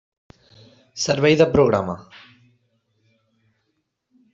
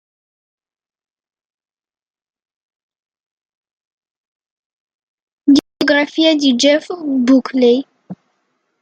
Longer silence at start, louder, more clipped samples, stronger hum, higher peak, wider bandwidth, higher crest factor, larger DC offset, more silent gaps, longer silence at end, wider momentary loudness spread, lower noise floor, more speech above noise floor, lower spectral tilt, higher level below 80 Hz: second, 0.95 s vs 5.45 s; second, -18 LUFS vs -14 LUFS; neither; neither; about the same, -2 dBFS vs 0 dBFS; second, 7.8 kHz vs 9.2 kHz; about the same, 20 dB vs 18 dB; neither; neither; first, 2.35 s vs 0.65 s; first, 18 LU vs 7 LU; first, -73 dBFS vs -67 dBFS; about the same, 55 dB vs 54 dB; first, -5 dB/octave vs -3 dB/octave; first, -54 dBFS vs -64 dBFS